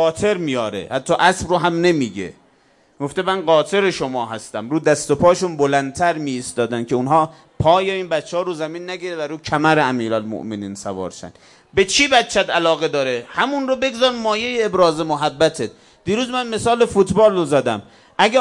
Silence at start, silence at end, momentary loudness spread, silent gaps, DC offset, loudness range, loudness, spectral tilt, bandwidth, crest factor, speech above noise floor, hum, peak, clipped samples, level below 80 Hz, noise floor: 0 s; 0 s; 12 LU; none; under 0.1%; 3 LU; -18 LUFS; -4.5 dB/octave; 11.5 kHz; 18 dB; 38 dB; none; 0 dBFS; under 0.1%; -50 dBFS; -56 dBFS